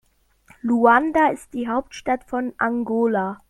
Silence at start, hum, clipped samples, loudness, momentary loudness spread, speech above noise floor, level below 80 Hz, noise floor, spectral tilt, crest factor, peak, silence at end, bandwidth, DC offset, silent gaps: 0.65 s; none; under 0.1%; -21 LUFS; 11 LU; 35 dB; -54 dBFS; -56 dBFS; -6 dB/octave; 18 dB; -4 dBFS; 0.15 s; 12 kHz; under 0.1%; none